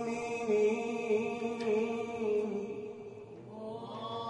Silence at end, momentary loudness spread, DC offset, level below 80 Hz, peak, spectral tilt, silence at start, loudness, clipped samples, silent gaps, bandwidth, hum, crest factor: 0 s; 16 LU; under 0.1%; -74 dBFS; -20 dBFS; -5.5 dB/octave; 0 s; -34 LUFS; under 0.1%; none; 10.5 kHz; none; 14 dB